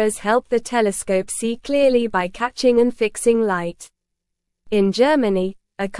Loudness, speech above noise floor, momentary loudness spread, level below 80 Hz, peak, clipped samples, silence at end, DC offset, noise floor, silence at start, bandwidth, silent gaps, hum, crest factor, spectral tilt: -19 LUFS; 60 dB; 8 LU; -50 dBFS; -4 dBFS; under 0.1%; 0 s; 0.2%; -78 dBFS; 0 s; 12 kHz; none; none; 16 dB; -4.5 dB/octave